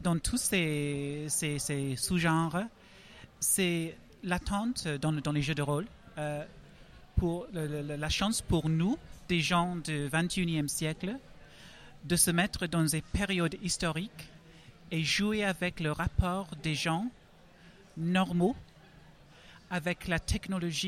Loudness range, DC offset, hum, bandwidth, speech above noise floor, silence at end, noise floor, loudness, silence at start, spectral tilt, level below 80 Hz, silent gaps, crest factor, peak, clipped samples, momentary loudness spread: 3 LU; under 0.1%; none; 15.5 kHz; 26 dB; 0 s; -57 dBFS; -31 LUFS; 0 s; -4 dB/octave; -46 dBFS; none; 20 dB; -12 dBFS; under 0.1%; 11 LU